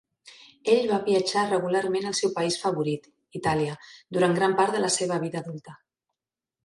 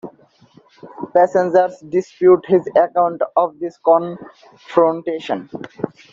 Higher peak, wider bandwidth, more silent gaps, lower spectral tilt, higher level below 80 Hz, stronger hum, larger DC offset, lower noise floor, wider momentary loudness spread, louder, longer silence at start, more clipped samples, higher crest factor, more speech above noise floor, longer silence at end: second, -8 dBFS vs -2 dBFS; first, 11.5 kHz vs 7.4 kHz; neither; second, -4.5 dB/octave vs -7.5 dB/octave; about the same, -64 dBFS vs -64 dBFS; neither; neither; first, -89 dBFS vs -51 dBFS; second, 12 LU vs 15 LU; second, -25 LUFS vs -17 LUFS; first, 0.25 s vs 0.05 s; neither; about the same, 18 dB vs 16 dB; first, 64 dB vs 34 dB; first, 0.9 s vs 0.25 s